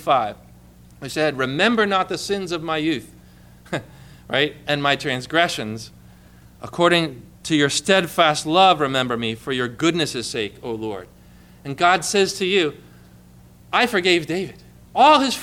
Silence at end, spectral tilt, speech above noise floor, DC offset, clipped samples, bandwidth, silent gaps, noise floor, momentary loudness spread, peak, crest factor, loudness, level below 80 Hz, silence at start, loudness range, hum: 0 s; -3.5 dB/octave; 28 dB; under 0.1%; under 0.1%; 18.5 kHz; none; -47 dBFS; 15 LU; -2 dBFS; 18 dB; -20 LUFS; -54 dBFS; 0 s; 5 LU; 60 Hz at -50 dBFS